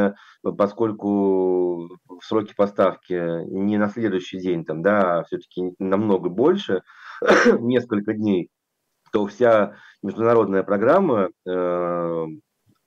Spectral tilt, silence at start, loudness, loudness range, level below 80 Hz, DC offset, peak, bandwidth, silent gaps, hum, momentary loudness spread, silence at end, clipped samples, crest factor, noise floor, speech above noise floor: -7 dB/octave; 0 s; -21 LUFS; 3 LU; -66 dBFS; under 0.1%; -6 dBFS; 7.8 kHz; none; none; 11 LU; 0.45 s; under 0.1%; 16 dB; -76 dBFS; 55 dB